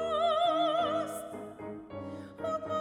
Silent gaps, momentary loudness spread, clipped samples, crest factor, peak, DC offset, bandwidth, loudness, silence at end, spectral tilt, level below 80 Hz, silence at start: none; 15 LU; under 0.1%; 14 dB; -18 dBFS; under 0.1%; 16 kHz; -31 LUFS; 0 s; -4.5 dB/octave; -66 dBFS; 0 s